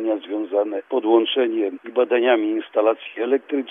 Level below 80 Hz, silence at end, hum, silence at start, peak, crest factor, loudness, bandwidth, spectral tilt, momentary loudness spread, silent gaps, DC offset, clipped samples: -90 dBFS; 0 s; none; 0 s; -4 dBFS; 16 dB; -21 LUFS; 3.8 kHz; -6.5 dB/octave; 6 LU; none; under 0.1%; under 0.1%